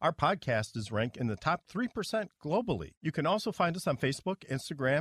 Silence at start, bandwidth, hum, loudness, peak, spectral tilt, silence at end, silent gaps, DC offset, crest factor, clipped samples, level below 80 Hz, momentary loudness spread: 0 s; 14.5 kHz; none; -33 LUFS; -14 dBFS; -5.5 dB/octave; 0 s; 2.97-3.01 s; under 0.1%; 18 dB; under 0.1%; -60 dBFS; 6 LU